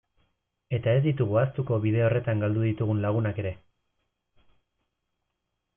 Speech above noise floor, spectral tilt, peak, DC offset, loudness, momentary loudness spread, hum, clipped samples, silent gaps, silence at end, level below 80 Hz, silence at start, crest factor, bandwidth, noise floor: 56 dB; -12 dB/octave; -12 dBFS; under 0.1%; -26 LUFS; 9 LU; none; under 0.1%; none; 2.2 s; -60 dBFS; 0.7 s; 16 dB; 3.6 kHz; -81 dBFS